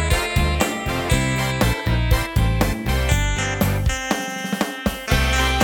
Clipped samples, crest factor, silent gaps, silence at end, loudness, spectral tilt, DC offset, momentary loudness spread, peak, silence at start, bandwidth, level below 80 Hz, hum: under 0.1%; 16 dB; none; 0 s; -21 LUFS; -4.5 dB/octave; under 0.1%; 4 LU; -4 dBFS; 0 s; 19 kHz; -24 dBFS; none